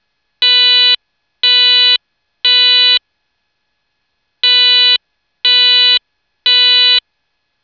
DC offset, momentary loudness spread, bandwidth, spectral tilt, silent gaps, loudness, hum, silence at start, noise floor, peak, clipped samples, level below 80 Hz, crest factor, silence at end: under 0.1%; 8 LU; 5.4 kHz; 3.5 dB/octave; none; -8 LUFS; none; 0.4 s; -68 dBFS; -2 dBFS; under 0.1%; -74 dBFS; 10 dB; 0.65 s